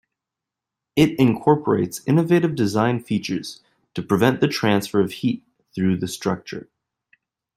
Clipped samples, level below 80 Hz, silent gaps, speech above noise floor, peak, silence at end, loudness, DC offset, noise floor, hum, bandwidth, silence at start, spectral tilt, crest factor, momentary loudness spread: under 0.1%; -56 dBFS; none; 66 dB; -2 dBFS; 0.95 s; -21 LUFS; under 0.1%; -86 dBFS; none; 16 kHz; 0.95 s; -6.5 dB/octave; 20 dB; 15 LU